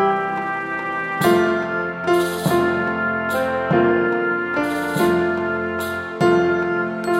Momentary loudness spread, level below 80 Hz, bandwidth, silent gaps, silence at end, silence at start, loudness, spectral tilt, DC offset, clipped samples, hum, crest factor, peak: 7 LU; -52 dBFS; 16 kHz; none; 0 s; 0 s; -20 LUFS; -6 dB/octave; under 0.1%; under 0.1%; none; 16 dB; -4 dBFS